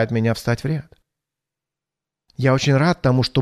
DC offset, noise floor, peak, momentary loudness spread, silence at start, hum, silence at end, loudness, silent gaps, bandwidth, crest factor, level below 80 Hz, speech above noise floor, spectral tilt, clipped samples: under 0.1%; -87 dBFS; -4 dBFS; 10 LU; 0 s; none; 0 s; -19 LUFS; none; 13.5 kHz; 16 dB; -48 dBFS; 68 dB; -6.5 dB/octave; under 0.1%